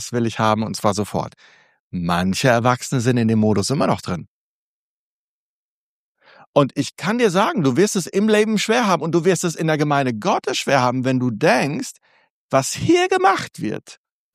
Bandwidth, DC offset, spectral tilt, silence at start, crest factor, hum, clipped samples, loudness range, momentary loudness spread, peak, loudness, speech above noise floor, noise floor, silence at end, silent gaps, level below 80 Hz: 15.5 kHz; under 0.1%; -5 dB/octave; 0 s; 18 dB; none; under 0.1%; 6 LU; 10 LU; -2 dBFS; -19 LUFS; over 71 dB; under -90 dBFS; 0.4 s; 1.80-1.91 s, 4.28-6.15 s, 6.47-6.53 s, 12.30-12.49 s; -56 dBFS